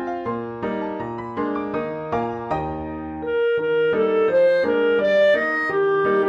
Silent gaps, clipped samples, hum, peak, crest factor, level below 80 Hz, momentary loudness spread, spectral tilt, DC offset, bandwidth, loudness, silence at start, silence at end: none; under 0.1%; none; -8 dBFS; 12 dB; -50 dBFS; 11 LU; -7 dB/octave; under 0.1%; 6.8 kHz; -21 LUFS; 0 s; 0 s